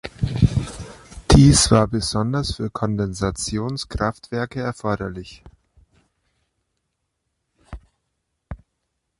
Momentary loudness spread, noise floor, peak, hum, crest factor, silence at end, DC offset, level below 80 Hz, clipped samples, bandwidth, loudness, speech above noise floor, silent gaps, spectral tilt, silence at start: 25 LU; -76 dBFS; -2 dBFS; none; 20 dB; 0.65 s; under 0.1%; -32 dBFS; under 0.1%; 11.5 kHz; -20 LUFS; 55 dB; none; -5 dB/octave; 0.05 s